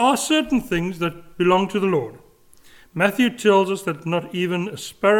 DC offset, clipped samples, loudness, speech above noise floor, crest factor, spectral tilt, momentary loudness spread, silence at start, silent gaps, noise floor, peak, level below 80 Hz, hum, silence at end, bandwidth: under 0.1%; under 0.1%; -21 LUFS; 30 dB; 18 dB; -5 dB/octave; 9 LU; 0 s; none; -50 dBFS; -2 dBFS; -50 dBFS; none; 0 s; 18 kHz